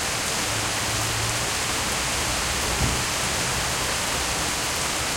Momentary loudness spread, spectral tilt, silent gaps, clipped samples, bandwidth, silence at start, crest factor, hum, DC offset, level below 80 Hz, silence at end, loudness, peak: 1 LU; -2 dB/octave; none; under 0.1%; 17 kHz; 0 s; 16 dB; none; under 0.1%; -38 dBFS; 0 s; -23 LUFS; -10 dBFS